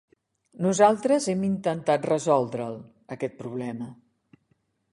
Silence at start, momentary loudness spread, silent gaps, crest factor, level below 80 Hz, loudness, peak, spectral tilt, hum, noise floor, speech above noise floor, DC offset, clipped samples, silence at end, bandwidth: 0.6 s; 17 LU; none; 20 dB; -68 dBFS; -25 LUFS; -6 dBFS; -5.5 dB/octave; none; -71 dBFS; 46 dB; under 0.1%; under 0.1%; 1 s; 11.5 kHz